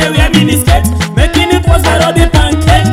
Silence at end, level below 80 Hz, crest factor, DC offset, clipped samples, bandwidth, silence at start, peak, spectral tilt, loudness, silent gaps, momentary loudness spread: 0 s; -14 dBFS; 8 dB; under 0.1%; 1%; 16.5 kHz; 0 s; 0 dBFS; -5 dB/octave; -9 LUFS; none; 2 LU